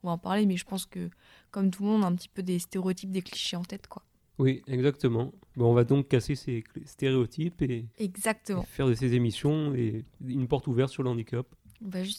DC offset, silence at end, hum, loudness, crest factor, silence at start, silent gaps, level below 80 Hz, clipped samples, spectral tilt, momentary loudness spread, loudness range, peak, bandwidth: under 0.1%; 0 s; none; -29 LUFS; 18 dB; 0.05 s; none; -54 dBFS; under 0.1%; -6.5 dB/octave; 12 LU; 3 LU; -10 dBFS; 15 kHz